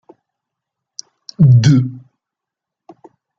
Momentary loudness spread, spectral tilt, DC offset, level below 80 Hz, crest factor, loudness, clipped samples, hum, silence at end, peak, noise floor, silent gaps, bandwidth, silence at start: 25 LU; -7 dB/octave; under 0.1%; -50 dBFS; 16 dB; -12 LUFS; under 0.1%; none; 1.4 s; 0 dBFS; -83 dBFS; none; 7.6 kHz; 1.4 s